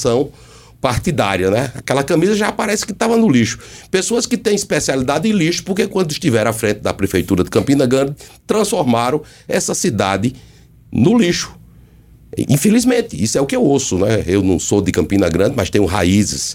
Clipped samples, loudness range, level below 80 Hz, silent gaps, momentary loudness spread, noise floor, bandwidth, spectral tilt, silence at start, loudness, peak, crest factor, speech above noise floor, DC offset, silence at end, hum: under 0.1%; 2 LU; -40 dBFS; none; 6 LU; -44 dBFS; 17 kHz; -5 dB/octave; 0 s; -16 LUFS; 0 dBFS; 16 dB; 29 dB; under 0.1%; 0 s; none